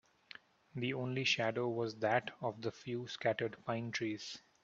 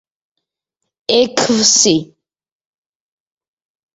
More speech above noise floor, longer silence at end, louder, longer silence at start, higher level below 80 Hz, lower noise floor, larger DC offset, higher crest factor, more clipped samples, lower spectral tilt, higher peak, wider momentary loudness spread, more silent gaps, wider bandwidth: second, 21 dB vs 65 dB; second, 0.25 s vs 1.9 s; second, -38 LUFS vs -12 LUFS; second, 0.75 s vs 1.1 s; second, -78 dBFS vs -58 dBFS; second, -59 dBFS vs -77 dBFS; neither; about the same, 22 dB vs 18 dB; neither; first, -5 dB/octave vs -2 dB/octave; second, -18 dBFS vs 0 dBFS; first, 16 LU vs 9 LU; neither; about the same, 7.8 kHz vs 8 kHz